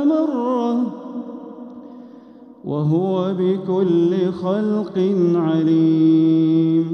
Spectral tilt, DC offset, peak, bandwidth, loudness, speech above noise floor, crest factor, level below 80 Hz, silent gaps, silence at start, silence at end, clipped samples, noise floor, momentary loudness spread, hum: -9.5 dB/octave; under 0.1%; -6 dBFS; 6 kHz; -18 LUFS; 26 dB; 12 dB; -68 dBFS; none; 0 s; 0 s; under 0.1%; -42 dBFS; 20 LU; none